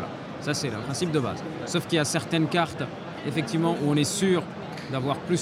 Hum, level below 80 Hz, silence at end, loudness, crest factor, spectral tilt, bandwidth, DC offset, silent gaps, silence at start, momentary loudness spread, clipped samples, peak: none; -60 dBFS; 0 s; -27 LUFS; 18 dB; -5 dB/octave; 16 kHz; under 0.1%; none; 0 s; 10 LU; under 0.1%; -10 dBFS